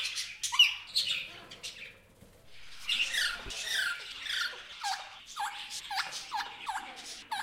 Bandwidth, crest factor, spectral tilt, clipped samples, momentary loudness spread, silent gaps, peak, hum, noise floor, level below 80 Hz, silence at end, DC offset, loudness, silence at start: 16 kHz; 24 dB; 2 dB/octave; under 0.1%; 18 LU; none; -12 dBFS; none; -58 dBFS; -62 dBFS; 0 s; under 0.1%; -32 LUFS; 0 s